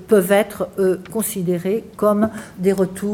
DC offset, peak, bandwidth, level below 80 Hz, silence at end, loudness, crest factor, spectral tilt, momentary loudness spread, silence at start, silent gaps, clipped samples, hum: under 0.1%; -2 dBFS; 17 kHz; -54 dBFS; 0 s; -19 LUFS; 18 dB; -6 dB/octave; 7 LU; 0 s; none; under 0.1%; none